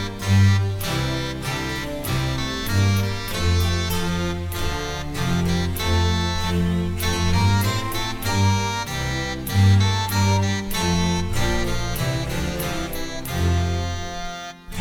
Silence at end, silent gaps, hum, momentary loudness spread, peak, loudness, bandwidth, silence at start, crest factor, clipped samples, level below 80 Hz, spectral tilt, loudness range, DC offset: 0 s; none; none; 8 LU; -6 dBFS; -22 LUFS; 17.5 kHz; 0 s; 14 dB; under 0.1%; -32 dBFS; -5 dB/octave; 3 LU; under 0.1%